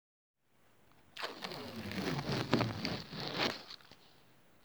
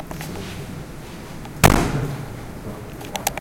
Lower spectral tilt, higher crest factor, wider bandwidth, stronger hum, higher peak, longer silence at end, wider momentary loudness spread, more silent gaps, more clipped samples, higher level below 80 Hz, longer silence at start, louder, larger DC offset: about the same, -5 dB/octave vs -4.5 dB/octave; first, 30 dB vs 24 dB; first, over 20 kHz vs 17 kHz; neither; second, -10 dBFS vs 0 dBFS; first, 0.55 s vs 0 s; about the same, 17 LU vs 19 LU; neither; neither; second, -64 dBFS vs -32 dBFS; first, 1.15 s vs 0 s; second, -38 LUFS vs -23 LUFS; neither